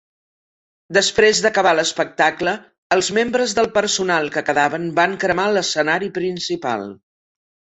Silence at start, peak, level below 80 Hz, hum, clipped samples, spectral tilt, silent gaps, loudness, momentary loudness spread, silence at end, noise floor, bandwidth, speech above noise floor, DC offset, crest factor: 0.9 s; 0 dBFS; -56 dBFS; none; under 0.1%; -3 dB/octave; 2.78-2.90 s; -18 LUFS; 9 LU; 0.8 s; under -90 dBFS; 8.4 kHz; over 72 dB; under 0.1%; 18 dB